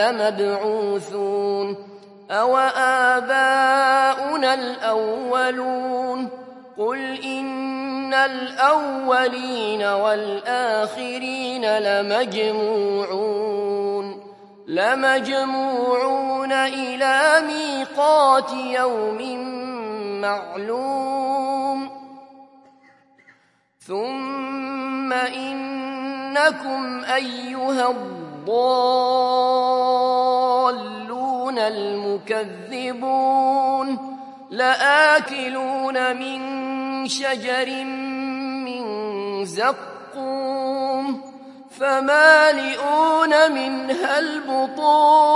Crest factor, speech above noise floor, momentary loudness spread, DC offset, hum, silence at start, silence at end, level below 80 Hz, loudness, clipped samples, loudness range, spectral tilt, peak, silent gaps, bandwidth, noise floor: 20 dB; 40 dB; 12 LU; under 0.1%; none; 0 s; 0 s; -82 dBFS; -20 LUFS; under 0.1%; 8 LU; -3 dB/octave; 0 dBFS; none; 11.5 kHz; -60 dBFS